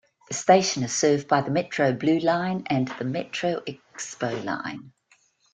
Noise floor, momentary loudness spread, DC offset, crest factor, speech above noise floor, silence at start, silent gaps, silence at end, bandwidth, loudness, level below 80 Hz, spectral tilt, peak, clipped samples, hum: -63 dBFS; 14 LU; under 0.1%; 20 dB; 39 dB; 0.3 s; none; 0.65 s; 9.6 kHz; -24 LUFS; -66 dBFS; -4.5 dB/octave; -4 dBFS; under 0.1%; none